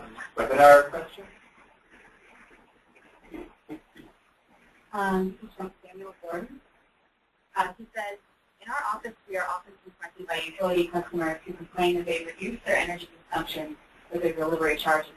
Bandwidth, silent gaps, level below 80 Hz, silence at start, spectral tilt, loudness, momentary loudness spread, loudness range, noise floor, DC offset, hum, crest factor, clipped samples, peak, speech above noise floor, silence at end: 13.5 kHz; none; -58 dBFS; 0 s; -4.5 dB/octave; -26 LUFS; 20 LU; 16 LU; -69 dBFS; under 0.1%; none; 24 dB; under 0.1%; -4 dBFS; 43 dB; 0.05 s